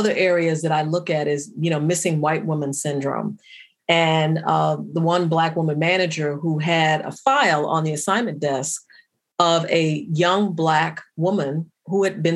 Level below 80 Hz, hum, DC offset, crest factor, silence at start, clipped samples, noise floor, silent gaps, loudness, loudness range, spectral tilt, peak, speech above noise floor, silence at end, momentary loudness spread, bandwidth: -76 dBFS; none; under 0.1%; 18 dB; 0 s; under 0.1%; -55 dBFS; none; -21 LUFS; 2 LU; -5 dB/octave; -2 dBFS; 34 dB; 0 s; 7 LU; 12.5 kHz